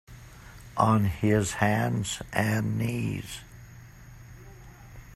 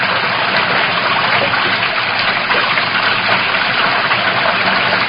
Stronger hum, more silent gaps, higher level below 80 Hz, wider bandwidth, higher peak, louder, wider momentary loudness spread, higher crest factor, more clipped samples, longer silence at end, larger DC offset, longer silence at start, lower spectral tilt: neither; neither; about the same, -50 dBFS vs -48 dBFS; first, 14 kHz vs 5.6 kHz; second, -6 dBFS vs 0 dBFS; second, -27 LUFS vs -13 LUFS; first, 24 LU vs 1 LU; first, 22 dB vs 14 dB; neither; about the same, 0 s vs 0 s; neither; about the same, 0.1 s vs 0 s; second, -5.5 dB/octave vs -7 dB/octave